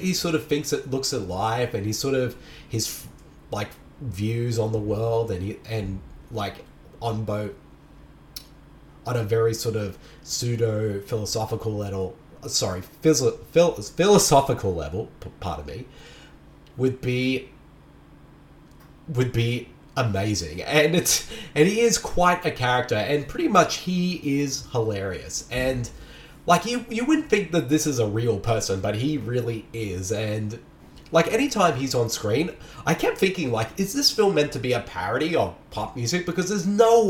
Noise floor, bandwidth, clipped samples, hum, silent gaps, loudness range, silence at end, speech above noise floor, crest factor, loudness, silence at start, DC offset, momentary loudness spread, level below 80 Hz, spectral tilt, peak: -49 dBFS; 19 kHz; under 0.1%; none; none; 8 LU; 0 s; 26 dB; 22 dB; -24 LUFS; 0 s; under 0.1%; 14 LU; -46 dBFS; -4.5 dB/octave; -4 dBFS